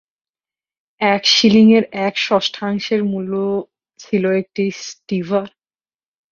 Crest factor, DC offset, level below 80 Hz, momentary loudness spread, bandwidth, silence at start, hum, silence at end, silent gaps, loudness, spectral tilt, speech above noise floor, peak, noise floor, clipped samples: 18 dB; under 0.1%; -60 dBFS; 13 LU; 7.2 kHz; 1 s; none; 0.85 s; none; -16 LUFS; -4.5 dB/octave; over 74 dB; 0 dBFS; under -90 dBFS; under 0.1%